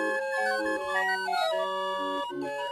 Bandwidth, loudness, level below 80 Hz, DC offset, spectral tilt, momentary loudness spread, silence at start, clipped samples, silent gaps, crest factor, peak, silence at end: 15 kHz; -29 LUFS; -70 dBFS; under 0.1%; -2.5 dB/octave; 5 LU; 0 s; under 0.1%; none; 14 dB; -14 dBFS; 0 s